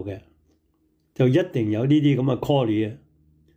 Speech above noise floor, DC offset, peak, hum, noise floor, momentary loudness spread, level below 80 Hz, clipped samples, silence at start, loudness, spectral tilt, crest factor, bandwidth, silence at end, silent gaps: 46 dB; under 0.1%; -8 dBFS; none; -66 dBFS; 16 LU; -58 dBFS; under 0.1%; 0 s; -22 LUFS; -8.5 dB/octave; 14 dB; 16 kHz; 0.6 s; none